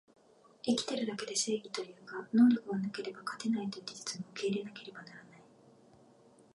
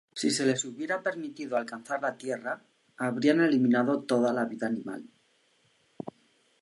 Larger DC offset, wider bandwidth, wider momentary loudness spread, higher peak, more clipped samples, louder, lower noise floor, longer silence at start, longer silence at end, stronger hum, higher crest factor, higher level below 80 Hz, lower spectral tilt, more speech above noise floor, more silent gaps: neither; about the same, 11.5 kHz vs 11.5 kHz; about the same, 19 LU vs 17 LU; second, -16 dBFS vs -10 dBFS; neither; second, -34 LUFS vs -29 LUFS; second, -62 dBFS vs -68 dBFS; first, 0.65 s vs 0.15 s; first, 1.3 s vs 0.5 s; neither; about the same, 20 dB vs 20 dB; about the same, -82 dBFS vs -82 dBFS; about the same, -4 dB/octave vs -4.5 dB/octave; second, 28 dB vs 40 dB; neither